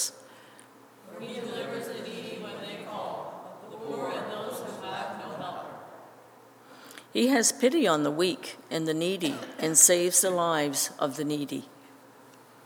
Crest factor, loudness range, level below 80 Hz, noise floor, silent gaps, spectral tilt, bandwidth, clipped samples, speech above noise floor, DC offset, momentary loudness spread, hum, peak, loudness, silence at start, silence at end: 26 dB; 14 LU; -88 dBFS; -54 dBFS; none; -2.5 dB/octave; over 20 kHz; under 0.1%; 28 dB; under 0.1%; 19 LU; none; -4 dBFS; -27 LUFS; 0 s; 0.35 s